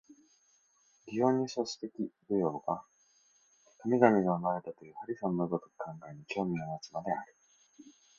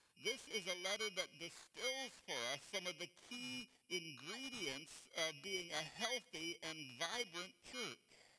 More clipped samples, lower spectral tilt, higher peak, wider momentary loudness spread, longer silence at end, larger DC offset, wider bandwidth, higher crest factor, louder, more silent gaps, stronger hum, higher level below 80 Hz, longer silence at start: neither; first, -6.5 dB/octave vs -1.5 dB/octave; first, -8 dBFS vs -24 dBFS; first, 17 LU vs 8 LU; first, 0.3 s vs 0 s; neither; second, 7.6 kHz vs 11 kHz; about the same, 26 dB vs 24 dB; first, -33 LUFS vs -45 LUFS; neither; neither; first, -74 dBFS vs -82 dBFS; about the same, 0.1 s vs 0.15 s